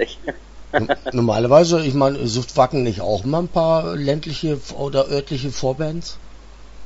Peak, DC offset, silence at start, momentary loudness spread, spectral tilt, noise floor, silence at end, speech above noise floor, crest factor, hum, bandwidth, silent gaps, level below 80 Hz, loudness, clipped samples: 0 dBFS; under 0.1%; 0 s; 12 LU; -6 dB/octave; -39 dBFS; 0 s; 20 dB; 18 dB; none; 8 kHz; none; -42 dBFS; -19 LUFS; under 0.1%